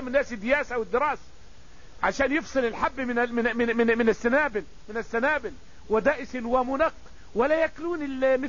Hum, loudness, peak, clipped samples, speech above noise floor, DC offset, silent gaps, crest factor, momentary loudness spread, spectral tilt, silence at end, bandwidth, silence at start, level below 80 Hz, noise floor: none; -26 LUFS; -8 dBFS; under 0.1%; 25 dB; 0.8%; none; 18 dB; 8 LU; -5 dB/octave; 0 s; 7.4 kHz; 0 s; -48 dBFS; -51 dBFS